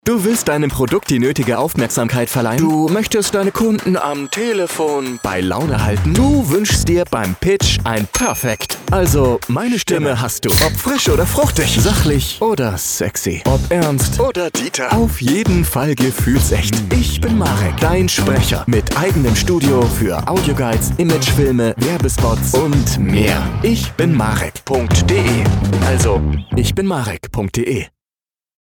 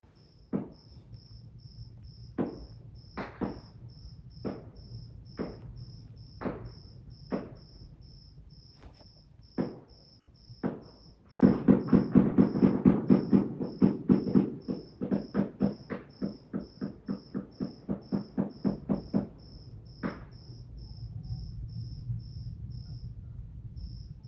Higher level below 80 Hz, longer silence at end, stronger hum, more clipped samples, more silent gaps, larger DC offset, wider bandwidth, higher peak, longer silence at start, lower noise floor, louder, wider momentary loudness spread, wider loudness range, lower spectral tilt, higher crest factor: first, -26 dBFS vs -52 dBFS; first, 0.75 s vs 0 s; neither; neither; neither; neither; first, 19.5 kHz vs 6 kHz; first, -2 dBFS vs -8 dBFS; second, 0.05 s vs 0.55 s; first, under -90 dBFS vs -58 dBFS; first, -15 LUFS vs -31 LUFS; second, 5 LU vs 25 LU; second, 2 LU vs 17 LU; second, -5 dB/octave vs -10.5 dB/octave; second, 12 dB vs 26 dB